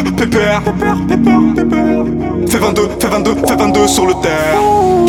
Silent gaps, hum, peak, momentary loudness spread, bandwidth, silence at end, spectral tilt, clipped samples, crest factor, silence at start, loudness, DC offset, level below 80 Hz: none; none; 0 dBFS; 4 LU; 18.5 kHz; 0 s; -5 dB/octave; under 0.1%; 12 dB; 0 s; -12 LUFS; under 0.1%; -30 dBFS